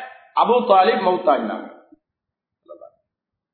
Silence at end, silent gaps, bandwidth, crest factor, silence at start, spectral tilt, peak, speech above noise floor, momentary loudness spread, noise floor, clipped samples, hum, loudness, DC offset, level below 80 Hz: 0.65 s; none; 4.5 kHz; 18 dB; 0 s; -8.5 dB/octave; -2 dBFS; 67 dB; 12 LU; -84 dBFS; under 0.1%; none; -18 LUFS; under 0.1%; -72 dBFS